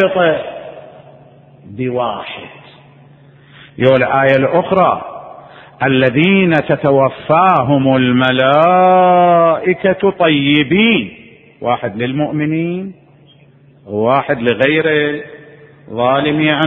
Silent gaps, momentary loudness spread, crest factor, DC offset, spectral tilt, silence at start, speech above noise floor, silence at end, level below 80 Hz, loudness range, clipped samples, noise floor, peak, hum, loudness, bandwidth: none; 16 LU; 14 dB; under 0.1%; -9 dB/octave; 0 s; 33 dB; 0 s; -50 dBFS; 9 LU; under 0.1%; -45 dBFS; 0 dBFS; none; -13 LUFS; 4.4 kHz